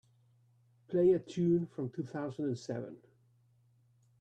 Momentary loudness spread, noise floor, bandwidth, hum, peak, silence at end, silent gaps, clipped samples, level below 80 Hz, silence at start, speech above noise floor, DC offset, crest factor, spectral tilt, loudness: 12 LU; -69 dBFS; 8.2 kHz; none; -20 dBFS; 1.25 s; none; under 0.1%; -74 dBFS; 0.9 s; 36 dB; under 0.1%; 16 dB; -8.5 dB/octave; -34 LUFS